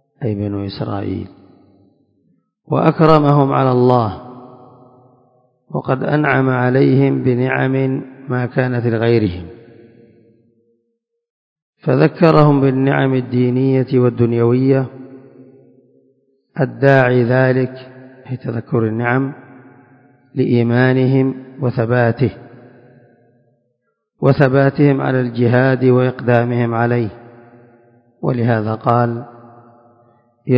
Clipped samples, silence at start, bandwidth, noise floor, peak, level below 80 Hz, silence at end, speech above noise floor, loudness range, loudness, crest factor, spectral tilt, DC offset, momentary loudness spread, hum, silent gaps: under 0.1%; 0.2 s; 5.4 kHz; -70 dBFS; 0 dBFS; -48 dBFS; 0 s; 56 dB; 6 LU; -15 LUFS; 16 dB; -10.5 dB/octave; under 0.1%; 13 LU; none; 11.30-11.56 s, 11.62-11.73 s